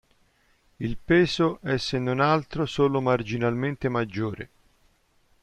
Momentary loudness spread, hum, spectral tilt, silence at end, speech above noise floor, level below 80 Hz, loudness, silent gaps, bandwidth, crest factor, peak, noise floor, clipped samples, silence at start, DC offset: 12 LU; none; -6.5 dB/octave; 1 s; 40 dB; -50 dBFS; -25 LUFS; none; 10.5 kHz; 18 dB; -10 dBFS; -64 dBFS; under 0.1%; 0.8 s; under 0.1%